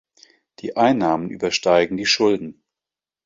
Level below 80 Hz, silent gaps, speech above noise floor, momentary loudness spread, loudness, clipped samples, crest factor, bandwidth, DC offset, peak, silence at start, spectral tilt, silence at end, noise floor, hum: -58 dBFS; none; 70 dB; 11 LU; -19 LUFS; under 0.1%; 18 dB; 7.8 kHz; under 0.1%; -2 dBFS; 0.65 s; -4 dB/octave; 0.75 s; -89 dBFS; none